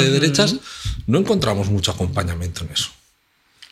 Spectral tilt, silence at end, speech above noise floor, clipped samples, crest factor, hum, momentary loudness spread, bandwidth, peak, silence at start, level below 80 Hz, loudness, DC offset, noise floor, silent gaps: -4.5 dB/octave; 0.05 s; 42 dB; under 0.1%; 20 dB; none; 11 LU; 15 kHz; 0 dBFS; 0 s; -38 dBFS; -20 LUFS; under 0.1%; -61 dBFS; none